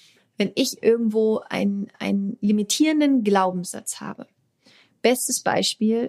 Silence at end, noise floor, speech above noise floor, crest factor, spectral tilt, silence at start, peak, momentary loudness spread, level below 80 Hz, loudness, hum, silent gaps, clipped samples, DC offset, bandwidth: 0 s; -57 dBFS; 36 dB; 18 dB; -4 dB/octave; 0.4 s; -4 dBFS; 11 LU; -74 dBFS; -22 LUFS; none; none; under 0.1%; under 0.1%; 15.5 kHz